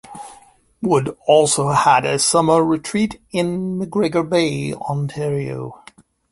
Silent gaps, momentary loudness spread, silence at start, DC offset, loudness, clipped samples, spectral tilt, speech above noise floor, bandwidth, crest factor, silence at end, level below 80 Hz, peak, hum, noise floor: none; 12 LU; 0.1 s; under 0.1%; -18 LUFS; under 0.1%; -4.5 dB/octave; 31 dB; 11.5 kHz; 18 dB; 0.55 s; -54 dBFS; -2 dBFS; none; -49 dBFS